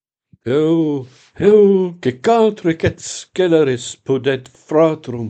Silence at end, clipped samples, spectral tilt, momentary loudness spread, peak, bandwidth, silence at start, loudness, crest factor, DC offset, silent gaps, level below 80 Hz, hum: 0 s; under 0.1%; -6 dB/octave; 12 LU; 0 dBFS; 9 kHz; 0.45 s; -16 LUFS; 16 dB; under 0.1%; none; -50 dBFS; none